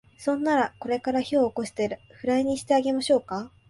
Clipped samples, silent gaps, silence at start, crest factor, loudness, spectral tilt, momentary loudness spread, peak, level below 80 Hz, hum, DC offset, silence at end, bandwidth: under 0.1%; none; 0.2 s; 16 dB; -26 LUFS; -4.5 dB/octave; 7 LU; -10 dBFS; -60 dBFS; none; under 0.1%; 0.2 s; 11.5 kHz